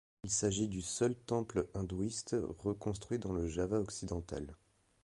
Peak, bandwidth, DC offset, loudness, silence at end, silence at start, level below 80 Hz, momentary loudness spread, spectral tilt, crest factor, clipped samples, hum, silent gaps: -20 dBFS; 11.5 kHz; under 0.1%; -37 LUFS; 0.5 s; 0.25 s; -54 dBFS; 7 LU; -5 dB/octave; 18 dB; under 0.1%; none; none